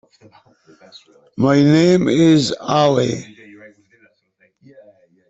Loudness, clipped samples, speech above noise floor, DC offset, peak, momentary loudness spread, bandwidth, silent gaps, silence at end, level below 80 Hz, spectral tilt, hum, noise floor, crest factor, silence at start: -15 LUFS; under 0.1%; 45 dB; under 0.1%; -2 dBFS; 10 LU; 8.2 kHz; none; 2.05 s; -56 dBFS; -6.5 dB/octave; none; -61 dBFS; 16 dB; 1.4 s